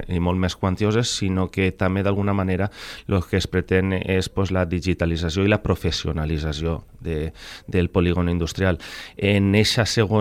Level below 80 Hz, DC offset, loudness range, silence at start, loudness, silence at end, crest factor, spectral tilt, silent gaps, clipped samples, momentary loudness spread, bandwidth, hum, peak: -36 dBFS; under 0.1%; 2 LU; 0 s; -22 LUFS; 0 s; 16 dB; -5.5 dB/octave; none; under 0.1%; 9 LU; 15 kHz; none; -4 dBFS